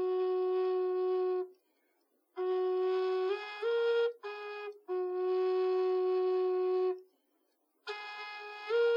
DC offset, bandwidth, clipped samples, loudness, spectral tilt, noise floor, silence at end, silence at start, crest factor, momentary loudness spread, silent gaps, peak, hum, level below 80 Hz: under 0.1%; 5.8 kHz; under 0.1%; -33 LUFS; -4 dB/octave; -77 dBFS; 0 s; 0 s; 10 dB; 12 LU; none; -22 dBFS; none; under -90 dBFS